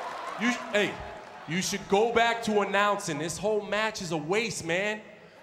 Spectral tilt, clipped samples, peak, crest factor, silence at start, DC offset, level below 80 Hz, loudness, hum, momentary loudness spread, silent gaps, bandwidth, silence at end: -3.5 dB/octave; under 0.1%; -10 dBFS; 20 dB; 0 s; under 0.1%; -60 dBFS; -28 LUFS; none; 9 LU; none; 16 kHz; 0 s